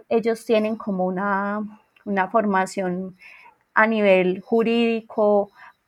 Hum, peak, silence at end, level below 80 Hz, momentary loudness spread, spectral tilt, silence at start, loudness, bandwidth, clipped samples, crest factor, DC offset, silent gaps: none; -4 dBFS; 0.2 s; -70 dBFS; 12 LU; -6.5 dB/octave; 0.1 s; -21 LUFS; 13.5 kHz; under 0.1%; 18 dB; under 0.1%; none